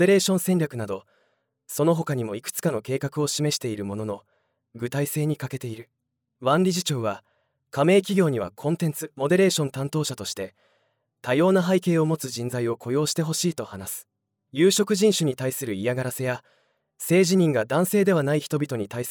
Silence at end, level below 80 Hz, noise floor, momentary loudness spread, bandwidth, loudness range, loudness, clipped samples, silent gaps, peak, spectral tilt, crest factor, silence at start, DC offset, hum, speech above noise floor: 0 s; -70 dBFS; -70 dBFS; 14 LU; over 20 kHz; 4 LU; -24 LUFS; under 0.1%; none; -8 dBFS; -5 dB/octave; 16 dB; 0 s; under 0.1%; none; 47 dB